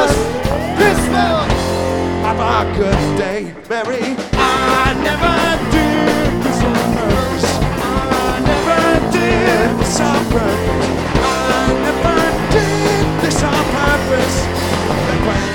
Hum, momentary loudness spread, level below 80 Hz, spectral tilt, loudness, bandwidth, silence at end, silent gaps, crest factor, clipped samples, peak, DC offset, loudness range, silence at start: none; 4 LU; -26 dBFS; -5 dB/octave; -15 LUFS; over 20 kHz; 0 s; none; 14 dB; under 0.1%; 0 dBFS; 0.5%; 1 LU; 0 s